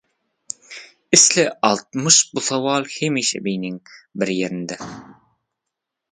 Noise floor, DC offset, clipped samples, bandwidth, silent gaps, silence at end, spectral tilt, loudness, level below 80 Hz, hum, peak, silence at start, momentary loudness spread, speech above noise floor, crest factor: -82 dBFS; under 0.1%; under 0.1%; 11 kHz; none; 1 s; -2 dB/octave; -17 LUFS; -64 dBFS; none; 0 dBFS; 0.7 s; 22 LU; 62 dB; 22 dB